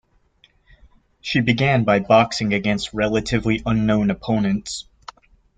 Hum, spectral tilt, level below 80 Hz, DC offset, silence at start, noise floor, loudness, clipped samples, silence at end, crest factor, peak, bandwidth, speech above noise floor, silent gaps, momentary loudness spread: none; -6 dB/octave; -44 dBFS; under 0.1%; 1.25 s; -58 dBFS; -19 LUFS; under 0.1%; 0.75 s; 18 dB; -2 dBFS; 9.4 kHz; 39 dB; none; 10 LU